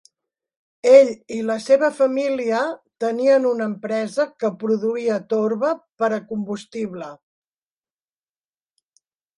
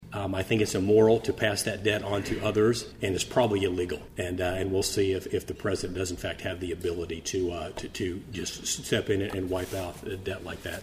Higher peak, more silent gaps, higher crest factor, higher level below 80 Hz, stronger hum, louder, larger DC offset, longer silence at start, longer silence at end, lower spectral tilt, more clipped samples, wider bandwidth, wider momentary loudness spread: first, 0 dBFS vs -10 dBFS; neither; about the same, 20 dB vs 20 dB; second, -72 dBFS vs -50 dBFS; neither; first, -20 LUFS vs -29 LUFS; neither; first, 0.85 s vs 0 s; first, 2.25 s vs 0 s; about the same, -5.5 dB/octave vs -4.5 dB/octave; neither; second, 11 kHz vs 15.5 kHz; first, 14 LU vs 10 LU